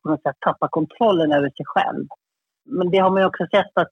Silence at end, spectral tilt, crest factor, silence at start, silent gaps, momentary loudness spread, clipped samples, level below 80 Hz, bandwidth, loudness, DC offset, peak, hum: 0.05 s; -7.5 dB/octave; 16 dB; 0.05 s; none; 8 LU; under 0.1%; -66 dBFS; 6.6 kHz; -20 LUFS; under 0.1%; -4 dBFS; none